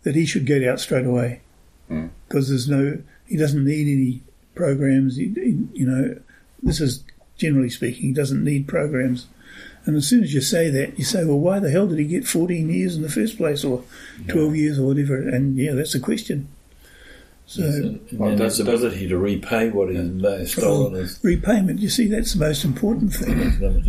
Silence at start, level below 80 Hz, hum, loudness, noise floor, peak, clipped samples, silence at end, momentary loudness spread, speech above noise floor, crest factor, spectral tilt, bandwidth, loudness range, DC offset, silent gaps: 0.05 s; -34 dBFS; none; -21 LUFS; -48 dBFS; -6 dBFS; under 0.1%; 0 s; 9 LU; 27 dB; 14 dB; -6 dB/octave; 15.5 kHz; 3 LU; under 0.1%; none